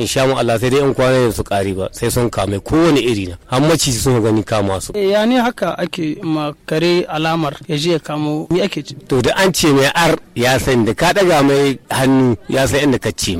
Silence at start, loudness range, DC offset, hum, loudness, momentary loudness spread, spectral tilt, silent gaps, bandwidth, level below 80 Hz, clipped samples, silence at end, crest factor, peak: 0 s; 4 LU; under 0.1%; none; -15 LUFS; 8 LU; -5 dB/octave; none; 16.5 kHz; -38 dBFS; under 0.1%; 0 s; 10 dB; -4 dBFS